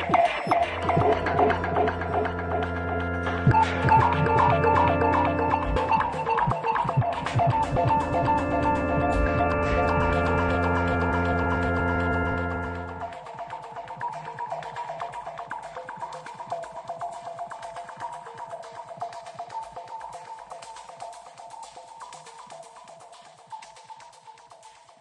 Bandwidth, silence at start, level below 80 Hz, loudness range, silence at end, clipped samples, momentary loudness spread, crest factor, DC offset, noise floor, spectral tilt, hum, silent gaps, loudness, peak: 11 kHz; 0 s; -42 dBFS; 19 LU; 0.3 s; under 0.1%; 21 LU; 18 dB; under 0.1%; -50 dBFS; -7 dB/octave; none; none; -25 LUFS; -8 dBFS